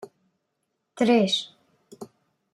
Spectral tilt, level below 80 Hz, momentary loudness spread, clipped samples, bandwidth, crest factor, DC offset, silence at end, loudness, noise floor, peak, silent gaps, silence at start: -4.5 dB/octave; -74 dBFS; 25 LU; under 0.1%; 12 kHz; 20 dB; under 0.1%; 0.5 s; -22 LUFS; -78 dBFS; -8 dBFS; none; 0 s